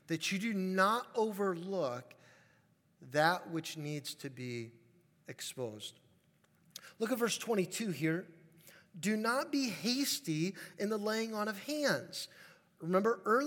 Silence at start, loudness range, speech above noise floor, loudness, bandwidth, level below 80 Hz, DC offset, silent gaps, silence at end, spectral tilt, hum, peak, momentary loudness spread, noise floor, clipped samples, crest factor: 0.1 s; 6 LU; 35 dB; -35 LUFS; 18 kHz; under -90 dBFS; under 0.1%; none; 0 s; -4 dB/octave; none; -16 dBFS; 15 LU; -71 dBFS; under 0.1%; 22 dB